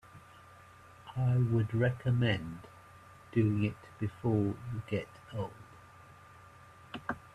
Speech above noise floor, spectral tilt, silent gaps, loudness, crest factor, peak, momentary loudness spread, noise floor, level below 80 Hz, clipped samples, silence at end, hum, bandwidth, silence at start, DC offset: 24 dB; -8.5 dB/octave; none; -33 LUFS; 18 dB; -16 dBFS; 25 LU; -56 dBFS; -62 dBFS; under 0.1%; 0.05 s; none; 10 kHz; 0.15 s; under 0.1%